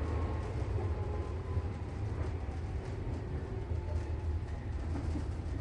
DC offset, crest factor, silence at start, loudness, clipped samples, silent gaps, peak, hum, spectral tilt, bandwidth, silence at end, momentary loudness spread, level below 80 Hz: under 0.1%; 14 dB; 0 s; -38 LUFS; under 0.1%; none; -22 dBFS; none; -8 dB/octave; 9.2 kHz; 0 s; 4 LU; -38 dBFS